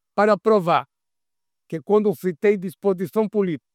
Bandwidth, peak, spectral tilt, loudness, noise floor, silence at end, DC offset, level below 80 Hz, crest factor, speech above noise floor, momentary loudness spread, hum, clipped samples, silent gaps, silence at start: 15 kHz; -4 dBFS; -7.5 dB/octave; -21 LUFS; -88 dBFS; 0.15 s; under 0.1%; -74 dBFS; 16 dB; 68 dB; 6 LU; none; under 0.1%; none; 0.15 s